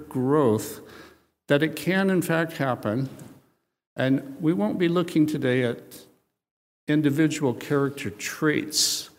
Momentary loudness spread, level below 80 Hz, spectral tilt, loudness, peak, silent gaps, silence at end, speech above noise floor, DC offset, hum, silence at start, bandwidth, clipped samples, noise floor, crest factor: 10 LU; -68 dBFS; -5 dB/octave; -24 LUFS; -6 dBFS; 3.87-3.96 s, 6.51-6.87 s; 0.1 s; 39 dB; under 0.1%; none; 0 s; 16 kHz; under 0.1%; -63 dBFS; 18 dB